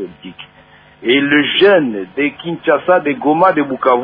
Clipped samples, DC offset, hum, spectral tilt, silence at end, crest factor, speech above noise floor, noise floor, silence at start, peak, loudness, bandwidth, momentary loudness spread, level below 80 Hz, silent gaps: under 0.1%; under 0.1%; none; -8 dB/octave; 0 s; 14 dB; 32 dB; -44 dBFS; 0 s; 0 dBFS; -13 LUFS; 5.2 kHz; 13 LU; -56 dBFS; none